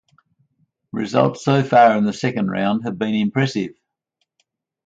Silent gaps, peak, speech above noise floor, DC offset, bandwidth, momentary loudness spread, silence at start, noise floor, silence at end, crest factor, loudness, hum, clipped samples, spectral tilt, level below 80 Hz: none; -2 dBFS; 56 dB; under 0.1%; 7.8 kHz; 13 LU; 0.95 s; -74 dBFS; 1.15 s; 18 dB; -18 LUFS; none; under 0.1%; -6.5 dB/octave; -60 dBFS